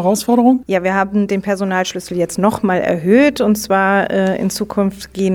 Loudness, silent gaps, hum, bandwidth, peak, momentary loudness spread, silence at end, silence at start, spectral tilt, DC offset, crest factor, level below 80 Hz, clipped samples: -15 LUFS; none; none; 18 kHz; -2 dBFS; 7 LU; 0 s; 0 s; -5.5 dB/octave; 0.1%; 14 dB; -48 dBFS; under 0.1%